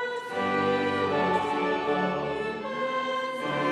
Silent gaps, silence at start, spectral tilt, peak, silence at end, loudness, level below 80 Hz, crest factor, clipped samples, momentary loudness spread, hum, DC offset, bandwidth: none; 0 s; -5.5 dB/octave; -14 dBFS; 0 s; -28 LUFS; -64 dBFS; 14 dB; under 0.1%; 6 LU; none; under 0.1%; 12.5 kHz